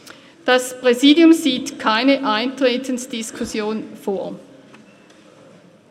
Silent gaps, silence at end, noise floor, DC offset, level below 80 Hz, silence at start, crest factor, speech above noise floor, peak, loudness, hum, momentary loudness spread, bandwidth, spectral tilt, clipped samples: none; 1.5 s; -47 dBFS; under 0.1%; -60 dBFS; 0.45 s; 18 dB; 30 dB; 0 dBFS; -18 LUFS; none; 15 LU; 15 kHz; -3 dB/octave; under 0.1%